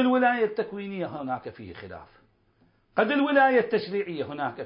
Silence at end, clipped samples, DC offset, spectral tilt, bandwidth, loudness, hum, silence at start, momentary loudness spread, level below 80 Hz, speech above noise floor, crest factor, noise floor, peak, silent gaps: 0 s; under 0.1%; under 0.1%; -9.5 dB/octave; 5.4 kHz; -26 LUFS; none; 0 s; 21 LU; -64 dBFS; 39 dB; 18 dB; -65 dBFS; -8 dBFS; none